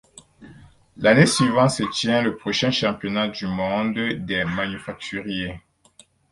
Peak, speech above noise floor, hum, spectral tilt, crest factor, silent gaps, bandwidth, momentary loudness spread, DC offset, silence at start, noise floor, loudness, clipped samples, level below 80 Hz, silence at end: -2 dBFS; 33 dB; none; -4.5 dB/octave; 22 dB; none; 11.5 kHz; 13 LU; under 0.1%; 0.4 s; -55 dBFS; -21 LUFS; under 0.1%; -52 dBFS; 0.75 s